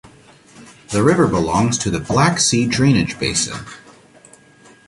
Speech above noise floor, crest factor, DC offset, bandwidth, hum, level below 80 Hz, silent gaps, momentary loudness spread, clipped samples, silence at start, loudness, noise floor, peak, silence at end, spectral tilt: 31 dB; 18 dB; under 0.1%; 11.5 kHz; none; -42 dBFS; none; 9 LU; under 0.1%; 0.6 s; -16 LUFS; -48 dBFS; 0 dBFS; 1.1 s; -4.5 dB/octave